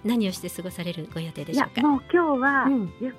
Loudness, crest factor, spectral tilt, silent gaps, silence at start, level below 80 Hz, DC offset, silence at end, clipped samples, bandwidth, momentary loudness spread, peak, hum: -25 LUFS; 18 dB; -5.5 dB/octave; none; 0.05 s; -58 dBFS; under 0.1%; 0 s; under 0.1%; 15.5 kHz; 12 LU; -8 dBFS; none